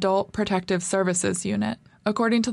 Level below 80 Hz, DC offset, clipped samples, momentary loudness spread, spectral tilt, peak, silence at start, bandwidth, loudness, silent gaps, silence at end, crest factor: -56 dBFS; under 0.1%; under 0.1%; 6 LU; -4.5 dB/octave; -10 dBFS; 0 s; 12 kHz; -25 LUFS; none; 0 s; 14 dB